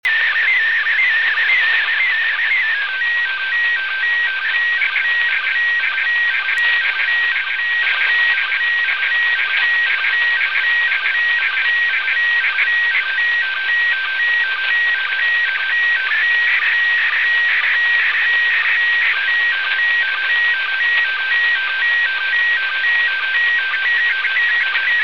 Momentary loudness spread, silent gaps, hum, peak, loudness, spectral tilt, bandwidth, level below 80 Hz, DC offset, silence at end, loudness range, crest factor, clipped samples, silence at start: 2 LU; none; none; -4 dBFS; -14 LUFS; 1 dB/octave; 7.4 kHz; -64 dBFS; 0.8%; 0 s; 2 LU; 12 dB; under 0.1%; 0.05 s